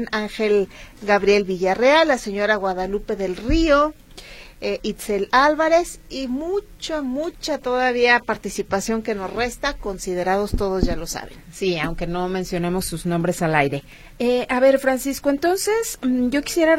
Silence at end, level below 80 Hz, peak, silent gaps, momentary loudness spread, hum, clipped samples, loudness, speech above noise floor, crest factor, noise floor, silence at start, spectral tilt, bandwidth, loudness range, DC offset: 0 s; -36 dBFS; -2 dBFS; none; 11 LU; none; under 0.1%; -21 LUFS; 20 dB; 18 dB; -41 dBFS; 0 s; -4.5 dB/octave; 16.5 kHz; 5 LU; under 0.1%